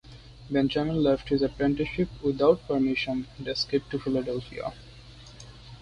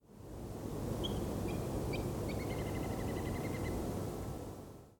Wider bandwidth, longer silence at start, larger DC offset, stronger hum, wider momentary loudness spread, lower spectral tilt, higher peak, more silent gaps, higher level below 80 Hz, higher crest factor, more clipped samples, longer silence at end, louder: second, 9.8 kHz vs 18 kHz; about the same, 0.05 s vs 0.1 s; neither; neither; first, 22 LU vs 8 LU; about the same, -6.5 dB/octave vs -6 dB/octave; first, -8 dBFS vs -26 dBFS; neither; about the same, -48 dBFS vs -48 dBFS; first, 20 dB vs 14 dB; neither; about the same, 0 s vs 0.05 s; first, -27 LUFS vs -40 LUFS